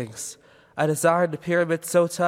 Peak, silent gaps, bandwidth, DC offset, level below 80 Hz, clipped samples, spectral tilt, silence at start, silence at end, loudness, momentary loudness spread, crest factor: -6 dBFS; none; 16.5 kHz; under 0.1%; -68 dBFS; under 0.1%; -5 dB/octave; 0 s; 0 s; -23 LUFS; 14 LU; 16 dB